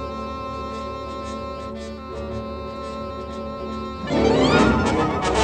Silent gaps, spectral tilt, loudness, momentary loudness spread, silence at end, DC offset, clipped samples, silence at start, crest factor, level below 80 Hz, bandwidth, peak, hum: none; -5.5 dB/octave; -24 LUFS; 15 LU; 0 s; under 0.1%; under 0.1%; 0 s; 20 dB; -36 dBFS; 10 kHz; -4 dBFS; none